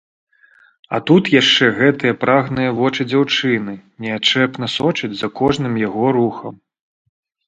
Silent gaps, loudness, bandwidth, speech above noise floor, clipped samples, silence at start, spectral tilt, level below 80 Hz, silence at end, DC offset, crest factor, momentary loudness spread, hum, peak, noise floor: none; -16 LUFS; 9 kHz; 36 dB; under 0.1%; 0.9 s; -5 dB/octave; -54 dBFS; 0.9 s; under 0.1%; 18 dB; 12 LU; none; 0 dBFS; -52 dBFS